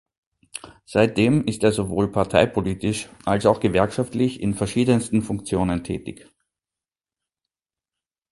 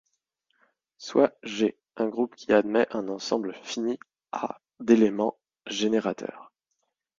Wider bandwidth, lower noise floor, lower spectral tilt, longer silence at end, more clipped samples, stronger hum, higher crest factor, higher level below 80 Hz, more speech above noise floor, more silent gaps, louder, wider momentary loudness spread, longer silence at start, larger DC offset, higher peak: first, 11.5 kHz vs 7.6 kHz; first, under -90 dBFS vs -80 dBFS; about the same, -6 dB/octave vs -5 dB/octave; first, 2.15 s vs 0.75 s; neither; neither; about the same, 22 dB vs 22 dB; first, -46 dBFS vs -68 dBFS; first, over 69 dB vs 54 dB; neither; first, -22 LUFS vs -27 LUFS; about the same, 12 LU vs 14 LU; second, 0.55 s vs 1 s; neither; first, -2 dBFS vs -6 dBFS